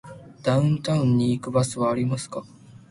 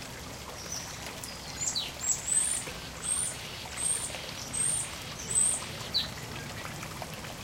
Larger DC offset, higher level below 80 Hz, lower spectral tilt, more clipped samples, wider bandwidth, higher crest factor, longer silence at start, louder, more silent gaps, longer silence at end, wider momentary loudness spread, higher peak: neither; about the same, -56 dBFS vs -54 dBFS; first, -6.5 dB/octave vs -1 dB/octave; neither; second, 11.5 kHz vs 17 kHz; about the same, 16 dB vs 18 dB; about the same, 0.05 s vs 0 s; first, -23 LUFS vs -31 LUFS; neither; first, 0.15 s vs 0 s; about the same, 12 LU vs 13 LU; first, -8 dBFS vs -16 dBFS